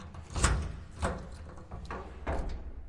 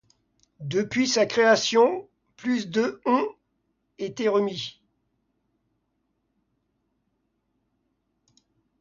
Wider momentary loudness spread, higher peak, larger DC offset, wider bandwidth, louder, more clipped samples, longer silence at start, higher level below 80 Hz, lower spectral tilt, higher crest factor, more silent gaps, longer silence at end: about the same, 16 LU vs 16 LU; second, -10 dBFS vs -6 dBFS; neither; first, 11.5 kHz vs 7.6 kHz; second, -36 LUFS vs -24 LUFS; neither; second, 0 s vs 0.6 s; first, -38 dBFS vs -70 dBFS; about the same, -4.5 dB/octave vs -4 dB/octave; first, 26 dB vs 20 dB; neither; second, 0 s vs 4.1 s